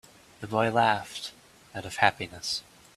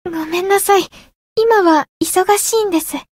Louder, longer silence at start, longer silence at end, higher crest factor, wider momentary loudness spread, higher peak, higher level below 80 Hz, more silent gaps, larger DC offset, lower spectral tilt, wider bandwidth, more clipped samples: second, -28 LUFS vs -14 LUFS; first, 0.4 s vs 0.05 s; first, 0.35 s vs 0.15 s; first, 26 dB vs 14 dB; first, 17 LU vs 8 LU; about the same, -4 dBFS vs -2 dBFS; second, -64 dBFS vs -54 dBFS; second, none vs 1.15-1.36 s, 1.89-2.00 s; neither; first, -3.5 dB/octave vs -2 dB/octave; second, 14.5 kHz vs 16.5 kHz; neither